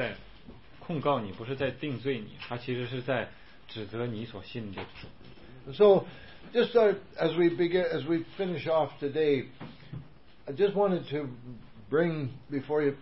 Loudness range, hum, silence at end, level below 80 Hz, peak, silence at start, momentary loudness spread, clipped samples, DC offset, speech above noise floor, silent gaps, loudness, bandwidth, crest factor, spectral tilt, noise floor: 9 LU; none; 0 s; -60 dBFS; -10 dBFS; 0 s; 21 LU; under 0.1%; 0.3%; 22 dB; none; -29 LUFS; 5.8 kHz; 20 dB; -10.5 dB/octave; -52 dBFS